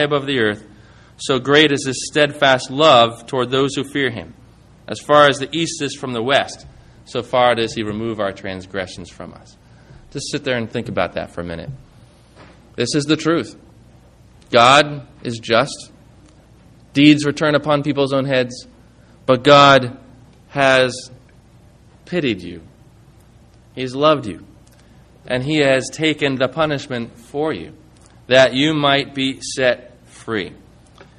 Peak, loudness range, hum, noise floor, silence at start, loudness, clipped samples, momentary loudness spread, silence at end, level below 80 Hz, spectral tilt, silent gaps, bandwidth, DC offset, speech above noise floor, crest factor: 0 dBFS; 9 LU; none; -47 dBFS; 0 s; -17 LUFS; under 0.1%; 18 LU; 0.65 s; -50 dBFS; -4.5 dB/octave; none; 11.5 kHz; under 0.1%; 30 dB; 18 dB